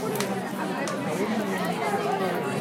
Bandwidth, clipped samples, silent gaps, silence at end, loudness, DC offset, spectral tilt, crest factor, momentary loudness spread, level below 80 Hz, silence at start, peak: 17 kHz; under 0.1%; none; 0 s; -28 LUFS; under 0.1%; -5 dB/octave; 20 dB; 3 LU; -68 dBFS; 0 s; -8 dBFS